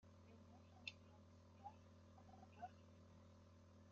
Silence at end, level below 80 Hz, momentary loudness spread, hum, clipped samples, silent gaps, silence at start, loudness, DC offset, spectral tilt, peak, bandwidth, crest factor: 0 s; -86 dBFS; 11 LU; none; under 0.1%; none; 0 s; -63 LUFS; under 0.1%; -3.5 dB/octave; -34 dBFS; 7.2 kHz; 28 dB